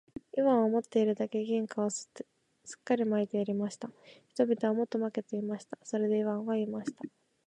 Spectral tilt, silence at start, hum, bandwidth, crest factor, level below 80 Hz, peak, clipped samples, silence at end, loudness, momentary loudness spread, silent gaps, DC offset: -6 dB/octave; 0.35 s; none; 10 kHz; 18 dB; -78 dBFS; -14 dBFS; under 0.1%; 0.4 s; -32 LUFS; 18 LU; none; under 0.1%